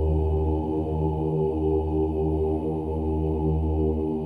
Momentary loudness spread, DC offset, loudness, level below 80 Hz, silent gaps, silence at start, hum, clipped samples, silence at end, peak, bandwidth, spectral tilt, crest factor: 3 LU; under 0.1%; -26 LUFS; -30 dBFS; none; 0 s; none; under 0.1%; 0 s; -14 dBFS; 3.2 kHz; -11.5 dB/octave; 10 dB